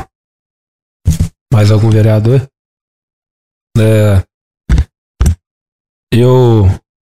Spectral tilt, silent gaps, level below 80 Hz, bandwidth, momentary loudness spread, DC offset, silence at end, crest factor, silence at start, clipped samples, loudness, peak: -7.5 dB/octave; 0.15-1.00 s, 1.41-1.46 s, 2.59-3.22 s, 3.30-3.67 s, 4.34-4.51 s, 4.98-5.14 s, 5.46-6.07 s; -22 dBFS; 13.5 kHz; 13 LU; under 0.1%; 0.15 s; 12 dB; 0 s; under 0.1%; -11 LUFS; 0 dBFS